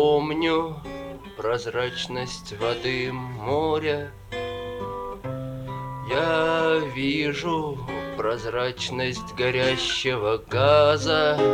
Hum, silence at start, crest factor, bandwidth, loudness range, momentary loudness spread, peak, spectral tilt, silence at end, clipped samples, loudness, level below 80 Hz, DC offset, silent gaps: none; 0 s; 18 dB; 15 kHz; 5 LU; 13 LU; -6 dBFS; -5 dB/octave; 0 s; under 0.1%; -25 LUFS; -48 dBFS; under 0.1%; none